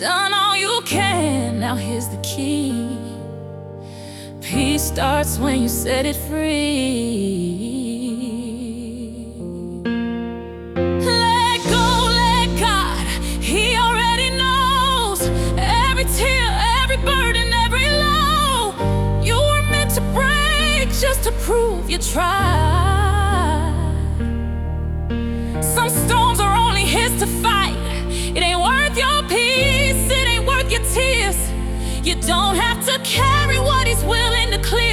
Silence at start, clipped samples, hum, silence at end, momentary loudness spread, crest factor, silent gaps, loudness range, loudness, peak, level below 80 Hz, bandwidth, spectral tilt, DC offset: 0 s; under 0.1%; none; 0 s; 10 LU; 14 dB; none; 6 LU; -18 LUFS; -4 dBFS; -24 dBFS; 18 kHz; -4 dB/octave; under 0.1%